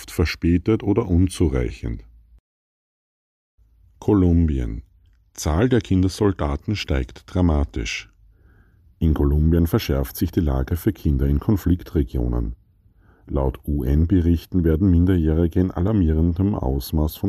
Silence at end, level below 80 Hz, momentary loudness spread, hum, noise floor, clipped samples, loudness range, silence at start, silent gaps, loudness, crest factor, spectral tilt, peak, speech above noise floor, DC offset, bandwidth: 0 s; -28 dBFS; 9 LU; none; -55 dBFS; under 0.1%; 5 LU; 0 s; 2.40-3.58 s; -21 LUFS; 14 dB; -7.5 dB/octave; -8 dBFS; 36 dB; under 0.1%; 15 kHz